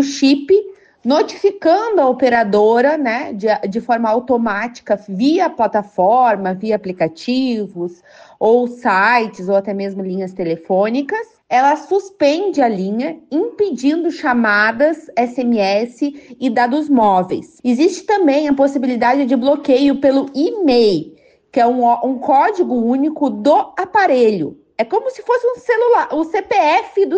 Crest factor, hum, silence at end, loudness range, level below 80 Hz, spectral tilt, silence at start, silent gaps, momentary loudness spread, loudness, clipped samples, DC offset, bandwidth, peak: 12 dB; none; 0 s; 2 LU; -58 dBFS; -5.5 dB/octave; 0 s; none; 9 LU; -15 LUFS; under 0.1%; under 0.1%; 8.6 kHz; -2 dBFS